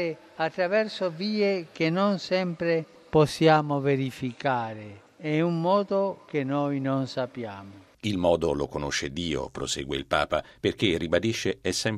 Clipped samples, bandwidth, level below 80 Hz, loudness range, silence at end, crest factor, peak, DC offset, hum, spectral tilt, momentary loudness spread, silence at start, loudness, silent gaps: under 0.1%; 14 kHz; -52 dBFS; 4 LU; 0 s; 20 dB; -6 dBFS; under 0.1%; none; -5.5 dB/octave; 8 LU; 0 s; -27 LUFS; none